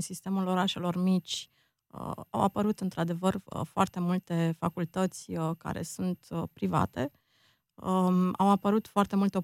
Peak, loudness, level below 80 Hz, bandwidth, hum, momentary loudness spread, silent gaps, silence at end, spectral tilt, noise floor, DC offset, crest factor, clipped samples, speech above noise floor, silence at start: -10 dBFS; -30 LUFS; -62 dBFS; 14.5 kHz; none; 10 LU; none; 0 s; -6.5 dB/octave; -69 dBFS; under 0.1%; 20 dB; under 0.1%; 39 dB; 0 s